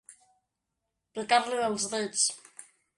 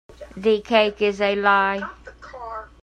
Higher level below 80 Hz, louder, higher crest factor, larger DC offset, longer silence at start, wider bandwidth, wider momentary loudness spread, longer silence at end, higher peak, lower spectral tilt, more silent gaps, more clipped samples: second, -74 dBFS vs -50 dBFS; second, -28 LUFS vs -20 LUFS; about the same, 20 dB vs 18 dB; neither; about the same, 0.1 s vs 0.2 s; first, 11.5 kHz vs 9.2 kHz; about the same, 18 LU vs 19 LU; first, 0.35 s vs 0.15 s; second, -12 dBFS vs -4 dBFS; second, -1 dB/octave vs -5 dB/octave; neither; neither